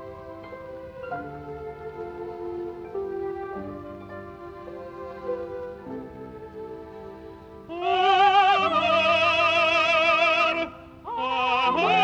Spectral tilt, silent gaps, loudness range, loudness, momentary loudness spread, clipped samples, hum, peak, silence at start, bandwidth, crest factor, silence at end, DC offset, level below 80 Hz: -4 dB/octave; none; 17 LU; -22 LUFS; 21 LU; under 0.1%; none; -8 dBFS; 0 s; 8.6 kHz; 18 dB; 0 s; under 0.1%; -56 dBFS